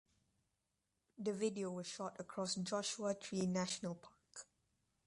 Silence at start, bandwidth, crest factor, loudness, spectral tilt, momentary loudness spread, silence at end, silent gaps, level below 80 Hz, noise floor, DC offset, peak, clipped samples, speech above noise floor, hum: 1.2 s; 11.5 kHz; 18 dB; -42 LUFS; -4.5 dB/octave; 16 LU; 0.65 s; none; -80 dBFS; -87 dBFS; under 0.1%; -26 dBFS; under 0.1%; 45 dB; none